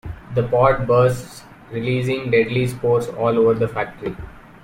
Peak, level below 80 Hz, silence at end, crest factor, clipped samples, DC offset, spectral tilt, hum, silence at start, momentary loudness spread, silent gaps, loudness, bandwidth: -4 dBFS; -44 dBFS; 0.25 s; 16 dB; under 0.1%; under 0.1%; -7 dB/octave; none; 0.05 s; 14 LU; none; -19 LUFS; 16.5 kHz